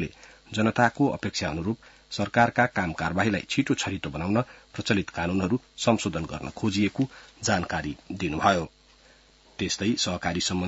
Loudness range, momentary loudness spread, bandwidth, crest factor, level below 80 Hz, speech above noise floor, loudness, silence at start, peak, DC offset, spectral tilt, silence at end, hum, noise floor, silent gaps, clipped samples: 3 LU; 11 LU; 8 kHz; 22 dB; -54 dBFS; 30 dB; -27 LUFS; 0 s; -6 dBFS; under 0.1%; -4.5 dB/octave; 0 s; none; -57 dBFS; none; under 0.1%